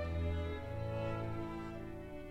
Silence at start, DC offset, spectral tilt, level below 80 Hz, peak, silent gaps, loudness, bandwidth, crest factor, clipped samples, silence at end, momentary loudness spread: 0 s; under 0.1%; -8 dB/octave; -48 dBFS; -28 dBFS; none; -42 LUFS; 8.6 kHz; 12 dB; under 0.1%; 0 s; 8 LU